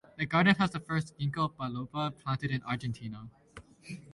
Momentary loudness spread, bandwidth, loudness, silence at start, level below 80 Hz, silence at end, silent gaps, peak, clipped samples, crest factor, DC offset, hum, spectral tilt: 21 LU; 11.5 kHz; -31 LUFS; 0.15 s; -62 dBFS; 0 s; none; -12 dBFS; under 0.1%; 22 dB; under 0.1%; none; -6.5 dB/octave